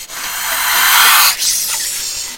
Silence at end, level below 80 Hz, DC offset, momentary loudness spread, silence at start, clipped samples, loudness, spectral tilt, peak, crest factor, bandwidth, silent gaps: 0 s; -48 dBFS; 0.4%; 12 LU; 0 s; 0.2%; -10 LUFS; 3 dB/octave; 0 dBFS; 14 dB; over 20 kHz; none